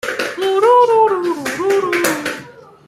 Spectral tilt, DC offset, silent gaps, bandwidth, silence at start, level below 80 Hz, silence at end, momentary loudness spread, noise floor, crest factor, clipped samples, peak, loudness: -3 dB/octave; under 0.1%; none; 16 kHz; 0.05 s; -62 dBFS; 0.35 s; 11 LU; -38 dBFS; 16 dB; under 0.1%; 0 dBFS; -15 LUFS